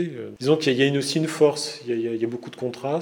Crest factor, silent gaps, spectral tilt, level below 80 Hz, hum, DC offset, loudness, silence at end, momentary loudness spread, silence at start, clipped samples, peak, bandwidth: 20 dB; none; -5 dB/octave; -74 dBFS; none; under 0.1%; -23 LUFS; 0 s; 10 LU; 0 s; under 0.1%; -4 dBFS; 18 kHz